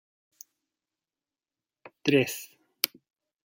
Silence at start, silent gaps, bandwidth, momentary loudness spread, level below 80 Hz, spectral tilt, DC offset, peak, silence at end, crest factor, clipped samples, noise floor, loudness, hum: 2.05 s; none; 17 kHz; 14 LU; -78 dBFS; -4 dB/octave; under 0.1%; 0 dBFS; 0.6 s; 34 dB; under 0.1%; under -90 dBFS; -28 LUFS; none